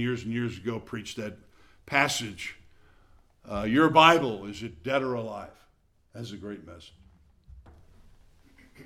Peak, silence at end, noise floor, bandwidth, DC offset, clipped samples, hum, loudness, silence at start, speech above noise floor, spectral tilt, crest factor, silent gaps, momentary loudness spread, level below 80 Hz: -2 dBFS; 0 s; -65 dBFS; 16.5 kHz; under 0.1%; under 0.1%; none; -26 LUFS; 0 s; 38 dB; -4.5 dB/octave; 26 dB; none; 22 LU; -56 dBFS